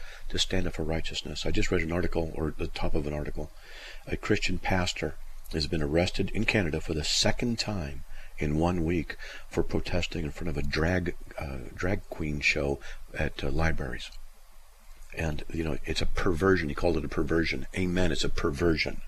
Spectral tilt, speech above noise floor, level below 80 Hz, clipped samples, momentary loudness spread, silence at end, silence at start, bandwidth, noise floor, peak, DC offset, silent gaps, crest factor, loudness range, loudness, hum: -5 dB/octave; 21 dB; -34 dBFS; under 0.1%; 12 LU; 0 s; 0 s; 13 kHz; -49 dBFS; -8 dBFS; under 0.1%; none; 20 dB; 4 LU; -30 LUFS; none